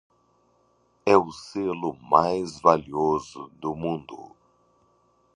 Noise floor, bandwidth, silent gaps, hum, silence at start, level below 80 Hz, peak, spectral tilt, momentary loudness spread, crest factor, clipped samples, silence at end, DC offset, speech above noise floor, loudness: -65 dBFS; 10.5 kHz; none; none; 1.05 s; -58 dBFS; -2 dBFS; -6 dB/octave; 13 LU; 24 dB; under 0.1%; 1.15 s; under 0.1%; 41 dB; -24 LUFS